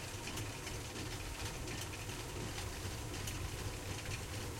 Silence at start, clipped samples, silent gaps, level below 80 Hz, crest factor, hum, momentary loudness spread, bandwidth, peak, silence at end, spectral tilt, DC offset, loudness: 0 s; under 0.1%; none; -50 dBFS; 16 dB; none; 1 LU; 16.5 kHz; -28 dBFS; 0 s; -3.5 dB/octave; under 0.1%; -43 LUFS